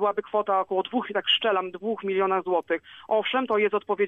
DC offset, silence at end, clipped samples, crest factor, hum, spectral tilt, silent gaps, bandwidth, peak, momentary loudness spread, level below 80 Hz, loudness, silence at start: under 0.1%; 0 s; under 0.1%; 14 dB; none; -6 dB/octave; none; 3.9 kHz; -10 dBFS; 7 LU; -72 dBFS; -25 LUFS; 0 s